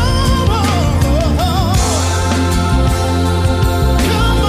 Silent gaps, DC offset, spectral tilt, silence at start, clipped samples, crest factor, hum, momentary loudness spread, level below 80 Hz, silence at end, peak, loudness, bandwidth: none; under 0.1%; -5.5 dB/octave; 0 s; under 0.1%; 10 dB; none; 1 LU; -18 dBFS; 0 s; -2 dBFS; -14 LUFS; 15.5 kHz